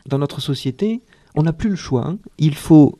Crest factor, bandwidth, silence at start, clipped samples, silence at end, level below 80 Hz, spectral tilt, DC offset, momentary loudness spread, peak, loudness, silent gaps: 16 dB; 13.5 kHz; 0.05 s; under 0.1%; 0.1 s; -42 dBFS; -7.5 dB/octave; under 0.1%; 11 LU; 0 dBFS; -19 LUFS; none